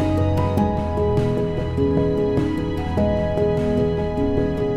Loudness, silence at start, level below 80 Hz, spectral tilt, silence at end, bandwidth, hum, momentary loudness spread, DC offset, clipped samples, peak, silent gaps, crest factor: -21 LUFS; 0 s; -34 dBFS; -9 dB/octave; 0 s; 13 kHz; none; 3 LU; under 0.1%; under 0.1%; -6 dBFS; none; 14 dB